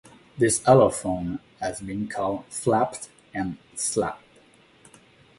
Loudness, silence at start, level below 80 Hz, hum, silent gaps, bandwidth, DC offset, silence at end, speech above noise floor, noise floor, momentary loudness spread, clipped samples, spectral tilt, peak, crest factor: -24 LUFS; 0.35 s; -54 dBFS; none; none; 12 kHz; under 0.1%; 1.2 s; 32 dB; -56 dBFS; 15 LU; under 0.1%; -5 dB/octave; -4 dBFS; 20 dB